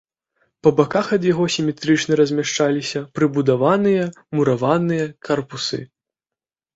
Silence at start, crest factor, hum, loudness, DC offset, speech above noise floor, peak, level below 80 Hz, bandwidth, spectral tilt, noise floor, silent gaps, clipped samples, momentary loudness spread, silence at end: 0.65 s; 18 dB; none; -19 LUFS; under 0.1%; 71 dB; -2 dBFS; -58 dBFS; 8 kHz; -5.5 dB/octave; -89 dBFS; none; under 0.1%; 8 LU; 0.9 s